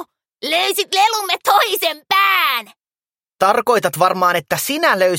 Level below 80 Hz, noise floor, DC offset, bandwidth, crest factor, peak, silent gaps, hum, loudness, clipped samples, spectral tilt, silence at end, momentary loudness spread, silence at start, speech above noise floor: -64 dBFS; under -90 dBFS; under 0.1%; 17 kHz; 16 dB; 0 dBFS; none; none; -16 LUFS; under 0.1%; -2 dB/octave; 0 s; 6 LU; 0 s; over 74 dB